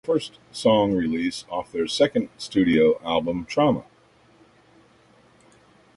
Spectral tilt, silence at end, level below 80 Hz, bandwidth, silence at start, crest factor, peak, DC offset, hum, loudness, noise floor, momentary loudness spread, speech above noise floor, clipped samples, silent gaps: -5.5 dB/octave; 2.15 s; -54 dBFS; 11.5 kHz; 0.05 s; 18 dB; -6 dBFS; under 0.1%; none; -23 LUFS; -57 dBFS; 9 LU; 34 dB; under 0.1%; none